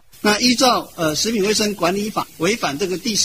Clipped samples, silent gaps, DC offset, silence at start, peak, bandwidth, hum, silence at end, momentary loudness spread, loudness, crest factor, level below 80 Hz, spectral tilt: under 0.1%; none; 0.3%; 0.25 s; -2 dBFS; 16 kHz; none; 0 s; 7 LU; -18 LUFS; 16 dB; -50 dBFS; -3 dB/octave